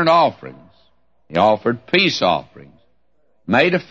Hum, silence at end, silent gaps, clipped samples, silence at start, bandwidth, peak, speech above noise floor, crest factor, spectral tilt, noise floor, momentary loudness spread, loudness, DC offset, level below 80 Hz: none; 0.1 s; none; under 0.1%; 0 s; 7.8 kHz; -2 dBFS; 49 dB; 16 dB; -5 dB/octave; -66 dBFS; 19 LU; -17 LUFS; 0.2%; -58 dBFS